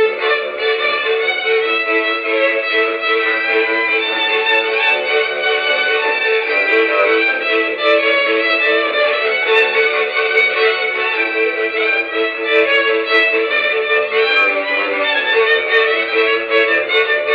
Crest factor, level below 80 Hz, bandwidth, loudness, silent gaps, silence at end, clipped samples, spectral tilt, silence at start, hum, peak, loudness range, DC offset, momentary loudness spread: 14 dB; -64 dBFS; 5.6 kHz; -14 LUFS; none; 0 s; under 0.1%; -3 dB/octave; 0 s; none; 0 dBFS; 1 LU; under 0.1%; 3 LU